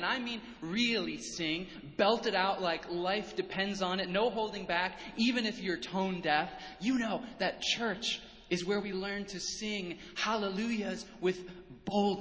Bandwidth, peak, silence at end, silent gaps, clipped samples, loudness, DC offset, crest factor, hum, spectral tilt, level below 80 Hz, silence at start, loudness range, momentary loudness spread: 8 kHz; -14 dBFS; 0 s; none; under 0.1%; -34 LUFS; under 0.1%; 20 dB; none; -4 dB/octave; -62 dBFS; 0 s; 3 LU; 8 LU